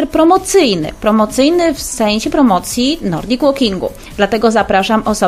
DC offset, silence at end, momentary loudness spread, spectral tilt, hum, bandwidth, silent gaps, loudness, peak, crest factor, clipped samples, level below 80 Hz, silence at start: 0.1%; 0 s; 6 LU; -4 dB/octave; none; 15.5 kHz; none; -13 LUFS; 0 dBFS; 12 dB; under 0.1%; -36 dBFS; 0 s